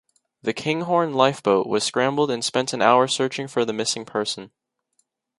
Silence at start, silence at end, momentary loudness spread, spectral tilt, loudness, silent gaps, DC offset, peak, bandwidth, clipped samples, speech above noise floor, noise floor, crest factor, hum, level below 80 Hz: 0.45 s; 0.95 s; 9 LU; -3.5 dB/octave; -22 LUFS; none; under 0.1%; 0 dBFS; 11.5 kHz; under 0.1%; 49 dB; -70 dBFS; 22 dB; none; -68 dBFS